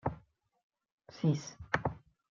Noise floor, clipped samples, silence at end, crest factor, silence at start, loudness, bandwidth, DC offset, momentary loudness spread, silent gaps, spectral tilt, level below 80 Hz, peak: -64 dBFS; under 0.1%; 0.35 s; 24 dB; 0.05 s; -36 LUFS; 7.4 kHz; under 0.1%; 21 LU; 0.63-0.70 s, 0.92-0.98 s; -6.5 dB/octave; -60 dBFS; -14 dBFS